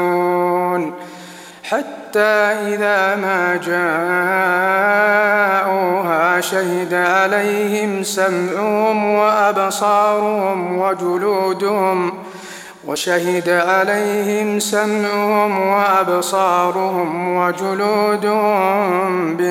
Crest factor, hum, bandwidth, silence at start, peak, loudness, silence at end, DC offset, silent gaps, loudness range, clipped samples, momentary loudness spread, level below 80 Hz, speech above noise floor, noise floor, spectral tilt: 14 dB; none; 16.5 kHz; 0 s; -2 dBFS; -16 LUFS; 0 s; under 0.1%; none; 3 LU; under 0.1%; 7 LU; -68 dBFS; 20 dB; -36 dBFS; -4.5 dB/octave